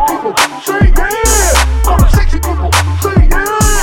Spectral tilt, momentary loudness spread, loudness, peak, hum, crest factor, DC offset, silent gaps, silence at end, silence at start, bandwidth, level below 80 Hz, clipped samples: -4 dB/octave; 3 LU; -11 LUFS; 0 dBFS; none; 10 dB; under 0.1%; none; 0 s; 0 s; 18.5 kHz; -12 dBFS; under 0.1%